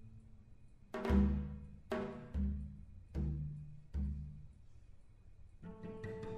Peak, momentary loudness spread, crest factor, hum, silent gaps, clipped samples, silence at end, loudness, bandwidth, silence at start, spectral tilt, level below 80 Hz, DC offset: -20 dBFS; 22 LU; 22 dB; none; none; under 0.1%; 0 s; -41 LUFS; 7.2 kHz; 0 s; -9 dB/octave; -44 dBFS; under 0.1%